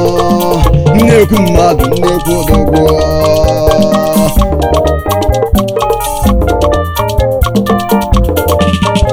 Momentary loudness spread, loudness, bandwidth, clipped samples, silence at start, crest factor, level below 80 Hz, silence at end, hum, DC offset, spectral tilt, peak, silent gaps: 4 LU; -10 LUFS; over 20 kHz; 2%; 0 s; 8 dB; -16 dBFS; 0 s; none; under 0.1%; -6 dB/octave; 0 dBFS; none